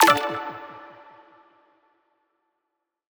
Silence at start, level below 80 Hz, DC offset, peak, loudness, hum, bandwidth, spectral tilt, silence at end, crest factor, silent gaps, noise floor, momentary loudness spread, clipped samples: 0 s; -70 dBFS; under 0.1%; -2 dBFS; -23 LUFS; none; over 20 kHz; -2 dB/octave; 2.3 s; 26 dB; none; -81 dBFS; 26 LU; under 0.1%